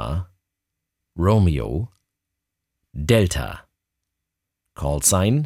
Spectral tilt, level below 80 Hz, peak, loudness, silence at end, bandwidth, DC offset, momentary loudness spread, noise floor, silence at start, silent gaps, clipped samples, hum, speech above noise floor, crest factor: -5 dB/octave; -36 dBFS; -4 dBFS; -21 LUFS; 0 s; 16.5 kHz; under 0.1%; 22 LU; -82 dBFS; 0 s; none; under 0.1%; none; 63 dB; 20 dB